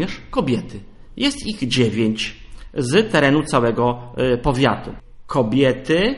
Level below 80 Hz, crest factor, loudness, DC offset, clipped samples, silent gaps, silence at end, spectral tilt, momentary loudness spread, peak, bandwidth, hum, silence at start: -38 dBFS; 18 dB; -19 LUFS; under 0.1%; under 0.1%; none; 0 s; -5.5 dB/octave; 11 LU; -2 dBFS; 11.5 kHz; none; 0 s